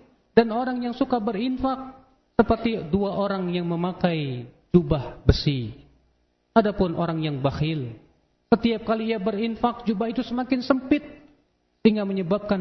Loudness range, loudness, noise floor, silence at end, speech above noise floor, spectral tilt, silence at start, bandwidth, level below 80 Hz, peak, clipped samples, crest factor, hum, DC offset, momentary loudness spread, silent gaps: 1 LU; -24 LUFS; -67 dBFS; 0 s; 44 dB; -8.5 dB/octave; 0.35 s; 6.2 kHz; -40 dBFS; -2 dBFS; under 0.1%; 24 dB; none; under 0.1%; 6 LU; none